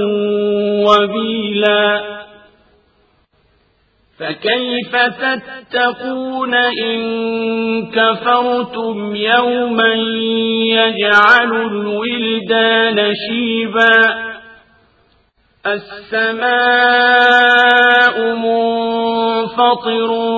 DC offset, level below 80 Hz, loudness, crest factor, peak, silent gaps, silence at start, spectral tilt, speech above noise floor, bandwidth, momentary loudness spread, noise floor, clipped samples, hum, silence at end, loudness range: under 0.1%; -58 dBFS; -13 LUFS; 14 dB; 0 dBFS; none; 0 s; -5 dB/octave; 43 dB; 8 kHz; 12 LU; -57 dBFS; under 0.1%; none; 0 s; 8 LU